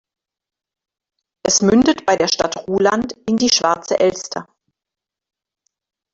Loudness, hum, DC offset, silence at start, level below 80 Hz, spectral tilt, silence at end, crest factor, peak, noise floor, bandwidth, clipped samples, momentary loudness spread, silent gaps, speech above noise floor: -16 LUFS; none; under 0.1%; 1.45 s; -52 dBFS; -3 dB/octave; 1.7 s; 18 dB; -2 dBFS; -86 dBFS; 8 kHz; under 0.1%; 11 LU; none; 70 dB